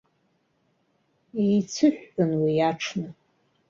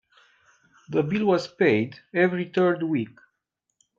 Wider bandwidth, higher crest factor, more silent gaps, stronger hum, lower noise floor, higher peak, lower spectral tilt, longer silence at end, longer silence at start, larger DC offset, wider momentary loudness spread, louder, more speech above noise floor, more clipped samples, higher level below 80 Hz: about the same, 7.6 kHz vs 7.4 kHz; about the same, 18 dB vs 20 dB; neither; neither; second, -70 dBFS vs -80 dBFS; about the same, -8 dBFS vs -6 dBFS; second, -6 dB/octave vs -7.5 dB/octave; second, 0.6 s vs 0.9 s; first, 1.35 s vs 0.9 s; neither; first, 12 LU vs 7 LU; about the same, -25 LUFS vs -24 LUFS; second, 46 dB vs 57 dB; neither; about the same, -66 dBFS vs -68 dBFS